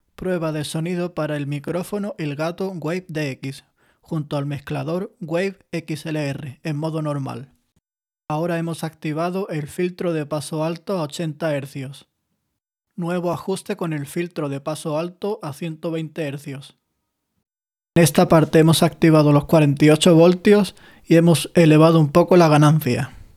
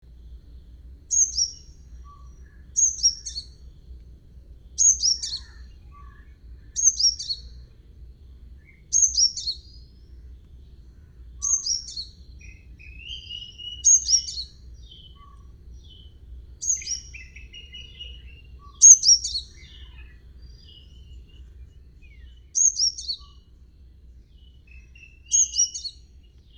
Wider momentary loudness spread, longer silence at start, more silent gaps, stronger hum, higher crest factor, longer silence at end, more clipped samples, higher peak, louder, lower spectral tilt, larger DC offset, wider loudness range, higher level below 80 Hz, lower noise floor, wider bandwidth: second, 15 LU vs 23 LU; about the same, 0.2 s vs 0.25 s; neither; neither; second, 18 dB vs 26 dB; second, 0.1 s vs 0.7 s; neither; about the same, -2 dBFS vs 0 dBFS; about the same, -20 LUFS vs -19 LUFS; first, -6.5 dB/octave vs 2 dB/octave; neither; about the same, 12 LU vs 12 LU; second, -54 dBFS vs -46 dBFS; first, -78 dBFS vs -50 dBFS; second, 15 kHz vs over 20 kHz